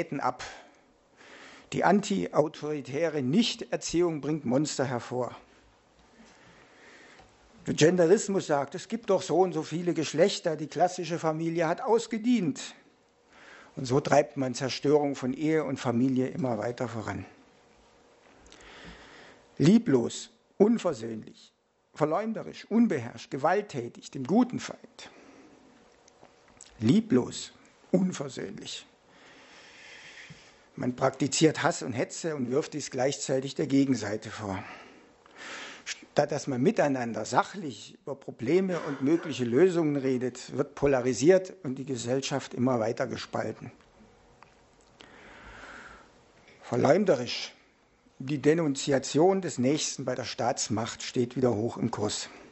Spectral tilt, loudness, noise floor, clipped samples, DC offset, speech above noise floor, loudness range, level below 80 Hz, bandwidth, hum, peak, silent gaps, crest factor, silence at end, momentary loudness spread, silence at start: -5.5 dB/octave; -28 LUFS; -63 dBFS; under 0.1%; under 0.1%; 36 dB; 6 LU; -66 dBFS; 8.2 kHz; none; -6 dBFS; none; 22 dB; 0.05 s; 18 LU; 0 s